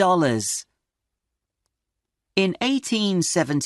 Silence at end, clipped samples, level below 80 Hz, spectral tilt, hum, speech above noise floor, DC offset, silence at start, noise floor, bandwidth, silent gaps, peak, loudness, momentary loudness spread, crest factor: 0 s; under 0.1%; -66 dBFS; -4 dB/octave; none; 61 dB; under 0.1%; 0 s; -83 dBFS; 12 kHz; none; -4 dBFS; -22 LUFS; 7 LU; 18 dB